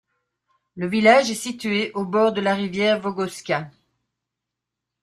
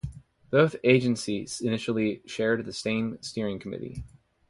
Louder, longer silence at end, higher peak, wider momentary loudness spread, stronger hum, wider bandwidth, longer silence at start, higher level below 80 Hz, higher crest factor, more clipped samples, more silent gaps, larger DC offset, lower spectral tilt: first, -21 LUFS vs -27 LUFS; first, 1.35 s vs 0.4 s; first, -2 dBFS vs -6 dBFS; second, 12 LU vs 15 LU; neither; first, 13.5 kHz vs 11.5 kHz; first, 0.75 s vs 0.05 s; second, -64 dBFS vs -54 dBFS; about the same, 20 dB vs 22 dB; neither; neither; neither; about the same, -4.5 dB/octave vs -5.5 dB/octave